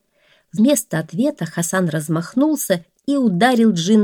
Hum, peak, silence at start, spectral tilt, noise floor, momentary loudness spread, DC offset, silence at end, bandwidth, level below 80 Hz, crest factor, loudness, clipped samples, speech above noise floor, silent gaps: none; 0 dBFS; 0.55 s; -5 dB/octave; -58 dBFS; 8 LU; under 0.1%; 0 s; 18 kHz; -66 dBFS; 16 dB; -18 LUFS; under 0.1%; 41 dB; none